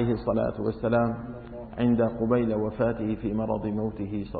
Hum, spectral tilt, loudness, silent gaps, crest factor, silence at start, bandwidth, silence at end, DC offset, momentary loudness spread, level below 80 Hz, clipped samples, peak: none; -12.5 dB/octave; -27 LUFS; none; 14 dB; 0 s; 4.7 kHz; 0 s; under 0.1%; 9 LU; -46 dBFS; under 0.1%; -12 dBFS